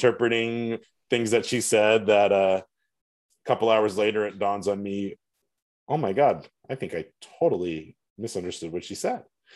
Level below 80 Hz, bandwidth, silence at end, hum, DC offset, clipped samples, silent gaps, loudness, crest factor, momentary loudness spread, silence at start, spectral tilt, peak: -68 dBFS; 12.5 kHz; 0.35 s; none; under 0.1%; under 0.1%; 3.01-3.29 s, 5.62-5.87 s, 8.10-8.16 s; -25 LUFS; 20 dB; 15 LU; 0 s; -4.5 dB/octave; -6 dBFS